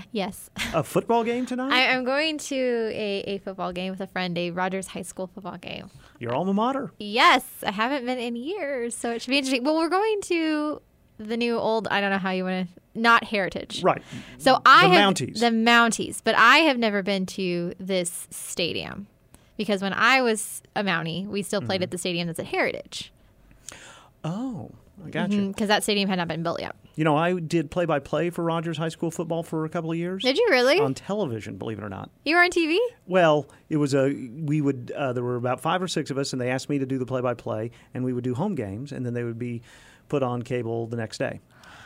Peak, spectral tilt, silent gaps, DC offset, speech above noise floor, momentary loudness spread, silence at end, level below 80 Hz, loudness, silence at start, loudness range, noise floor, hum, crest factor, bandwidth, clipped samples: -4 dBFS; -4.5 dB/octave; none; under 0.1%; 30 dB; 15 LU; 0 s; -60 dBFS; -24 LUFS; 0 s; 10 LU; -55 dBFS; none; 22 dB; 16 kHz; under 0.1%